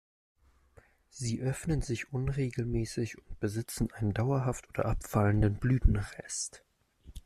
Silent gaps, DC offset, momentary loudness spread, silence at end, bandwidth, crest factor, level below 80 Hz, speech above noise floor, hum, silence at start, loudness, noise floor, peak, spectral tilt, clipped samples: none; under 0.1%; 9 LU; 0.05 s; 14 kHz; 22 dB; -40 dBFS; 31 dB; none; 1.15 s; -33 LUFS; -62 dBFS; -10 dBFS; -6 dB/octave; under 0.1%